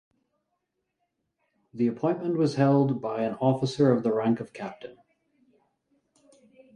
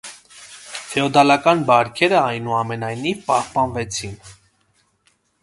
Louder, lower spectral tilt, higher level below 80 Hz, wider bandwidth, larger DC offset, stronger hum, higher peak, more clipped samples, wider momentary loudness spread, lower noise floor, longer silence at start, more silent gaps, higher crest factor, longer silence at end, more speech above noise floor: second, -26 LUFS vs -18 LUFS; first, -8 dB/octave vs -4.5 dB/octave; second, -70 dBFS vs -52 dBFS; about the same, 10.5 kHz vs 11.5 kHz; neither; neither; second, -10 dBFS vs 0 dBFS; neither; second, 16 LU vs 23 LU; first, -80 dBFS vs -63 dBFS; first, 1.75 s vs 0.05 s; neither; about the same, 18 dB vs 20 dB; first, 1.85 s vs 1.1 s; first, 55 dB vs 45 dB